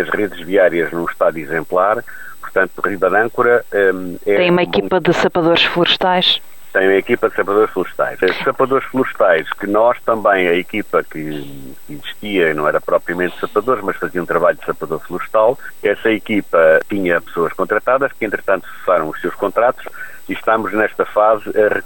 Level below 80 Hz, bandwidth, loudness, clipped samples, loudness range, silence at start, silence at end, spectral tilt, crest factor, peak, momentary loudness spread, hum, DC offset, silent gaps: -50 dBFS; 20 kHz; -16 LUFS; under 0.1%; 4 LU; 0 s; 0.05 s; -5.5 dB/octave; 14 dB; -2 dBFS; 9 LU; none; 2%; none